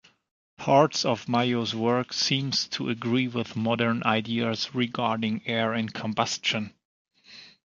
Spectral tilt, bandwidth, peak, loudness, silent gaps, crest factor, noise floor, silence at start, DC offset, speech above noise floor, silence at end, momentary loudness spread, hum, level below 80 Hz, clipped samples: -4.5 dB/octave; 7.6 kHz; -6 dBFS; -26 LUFS; 6.85-7.05 s; 22 dB; -51 dBFS; 0.6 s; under 0.1%; 25 dB; 0.2 s; 6 LU; none; -66 dBFS; under 0.1%